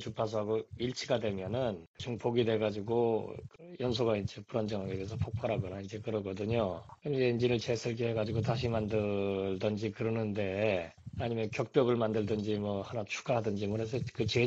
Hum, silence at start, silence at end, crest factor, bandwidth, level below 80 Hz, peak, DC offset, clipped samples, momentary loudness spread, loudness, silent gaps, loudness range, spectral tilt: none; 0 s; 0 s; 20 dB; 8 kHz; -60 dBFS; -14 dBFS; under 0.1%; under 0.1%; 7 LU; -34 LUFS; 1.87-1.94 s; 2 LU; -6.5 dB/octave